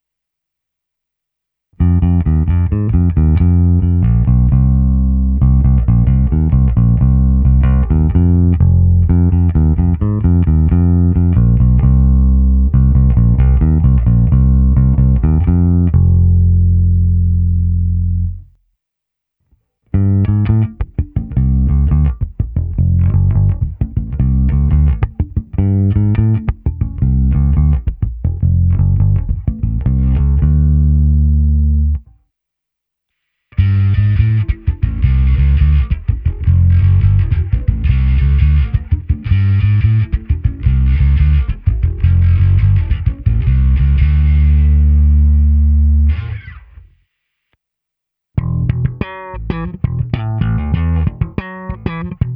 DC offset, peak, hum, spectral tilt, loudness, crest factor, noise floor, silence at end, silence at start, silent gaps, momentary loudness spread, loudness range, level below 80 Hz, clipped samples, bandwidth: under 0.1%; 0 dBFS; none; -12.5 dB/octave; -13 LUFS; 12 dB; -79 dBFS; 0 s; 1.8 s; none; 8 LU; 6 LU; -16 dBFS; under 0.1%; 3.6 kHz